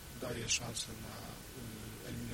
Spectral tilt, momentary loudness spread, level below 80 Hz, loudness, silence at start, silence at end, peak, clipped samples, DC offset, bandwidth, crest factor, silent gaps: -2.5 dB/octave; 13 LU; -56 dBFS; -40 LUFS; 0 s; 0 s; -20 dBFS; under 0.1%; under 0.1%; 16.5 kHz; 22 dB; none